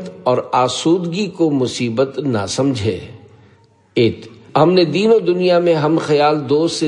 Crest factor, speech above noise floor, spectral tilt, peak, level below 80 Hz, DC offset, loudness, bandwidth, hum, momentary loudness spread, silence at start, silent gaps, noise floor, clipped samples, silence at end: 16 dB; 36 dB; -5.5 dB/octave; 0 dBFS; -58 dBFS; under 0.1%; -16 LUFS; 11 kHz; none; 8 LU; 0 s; none; -51 dBFS; under 0.1%; 0 s